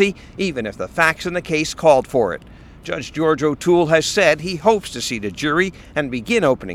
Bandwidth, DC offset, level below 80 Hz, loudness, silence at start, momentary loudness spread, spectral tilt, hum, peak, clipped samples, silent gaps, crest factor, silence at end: 16 kHz; under 0.1%; -46 dBFS; -18 LUFS; 0 s; 11 LU; -4.5 dB/octave; none; 0 dBFS; under 0.1%; none; 18 dB; 0 s